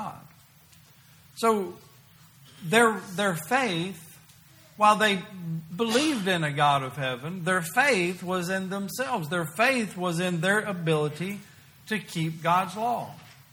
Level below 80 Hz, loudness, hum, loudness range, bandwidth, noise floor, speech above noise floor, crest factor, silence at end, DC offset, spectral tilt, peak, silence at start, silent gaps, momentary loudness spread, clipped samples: -68 dBFS; -26 LUFS; none; 3 LU; over 20 kHz; -55 dBFS; 29 dB; 22 dB; 0.2 s; under 0.1%; -4.5 dB/octave; -6 dBFS; 0 s; none; 13 LU; under 0.1%